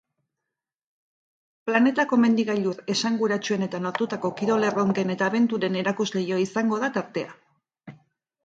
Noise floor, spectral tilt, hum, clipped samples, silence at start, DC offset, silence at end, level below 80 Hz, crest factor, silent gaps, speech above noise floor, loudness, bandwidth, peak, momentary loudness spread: -86 dBFS; -5.5 dB/octave; none; under 0.1%; 1.65 s; under 0.1%; 0.5 s; -72 dBFS; 18 dB; none; 62 dB; -24 LUFS; 7.8 kHz; -6 dBFS; 7 LU